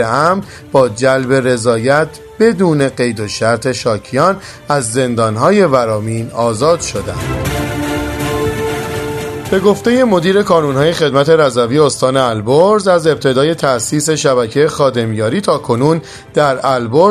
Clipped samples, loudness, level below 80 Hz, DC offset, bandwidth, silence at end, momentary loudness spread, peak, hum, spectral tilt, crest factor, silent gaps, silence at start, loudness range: under 0.1%; -13 LUFS; -38 dBFS; under 0.1%; 14 kHz; 0 s; 8 LU; 0 dBFS; none; -5 dB/octave; 12 dB; none; 0 s; 4 LU